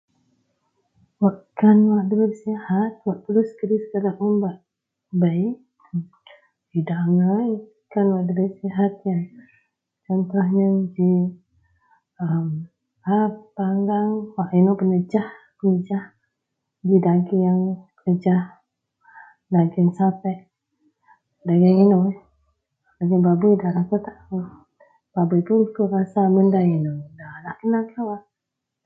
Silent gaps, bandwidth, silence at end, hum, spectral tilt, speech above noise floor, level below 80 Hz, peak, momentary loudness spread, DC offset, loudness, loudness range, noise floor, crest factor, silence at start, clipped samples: none; 4.7 kHz; 0.65 s; none; -11.5 dB/octave; 63 dB; -66 dBFS; -4 dBFS; 14 LU; under 0.1%; -21 LUFS; 4 LU; -83 dBFS; 18 dB; 1.2 s; under 0.1%